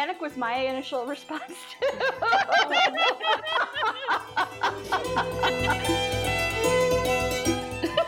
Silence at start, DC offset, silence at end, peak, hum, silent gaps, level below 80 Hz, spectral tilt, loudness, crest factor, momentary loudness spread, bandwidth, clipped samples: 0 s; under 0.1%; 0 s; -10 dBFS; none; none; -46 dBFS; -3.5 dB/octave; -25 LUFS; 14 dB; 9 LU; 20 kHz; under 0.1%